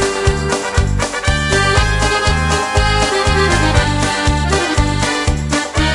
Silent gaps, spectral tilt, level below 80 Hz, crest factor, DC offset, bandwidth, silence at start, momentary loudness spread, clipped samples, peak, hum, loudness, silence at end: none; -4 dB/octave; -22 dBFS; 14 dB; under 0.1%; 11.5 kHz; 0 s; 4 LU; under 0.1%; -2 dBFS; none; -15 LUFS; 0 s